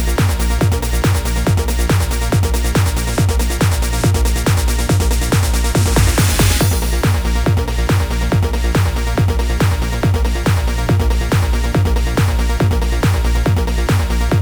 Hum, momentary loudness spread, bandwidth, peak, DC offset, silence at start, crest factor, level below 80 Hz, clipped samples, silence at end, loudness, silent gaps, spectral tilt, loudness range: none; 3 LU; over 20 kHz; 0 dBFS; 0.2%; 0 s; 14 dB; -18 dBFS; under 0.1%; 0 s; -16 LUFS; none; -5 dB/octave; 2 LU